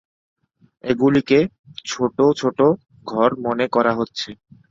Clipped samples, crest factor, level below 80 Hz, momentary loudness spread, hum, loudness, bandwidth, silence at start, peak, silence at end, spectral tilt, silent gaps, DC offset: under 0.1%; 18 dB; -56 dBFS; 12 LU; none; -19 LUFS; 7.8 kHz; 0.85 s; -2 dBFS; 0.35 s; -6 dB/octave; 1.59-1.64 s; under 0.1%